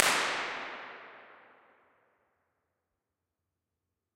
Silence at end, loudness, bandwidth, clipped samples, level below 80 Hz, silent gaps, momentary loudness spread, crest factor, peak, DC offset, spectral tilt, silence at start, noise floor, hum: 2.8 s; -32 LUFS; 16 kHz; under 0.1%; -82 dBFS; none; 25 LU; 38 dB; 0 dBFS; under 0.1%; 0 dB/octave; 0 s; -87 dBFS; none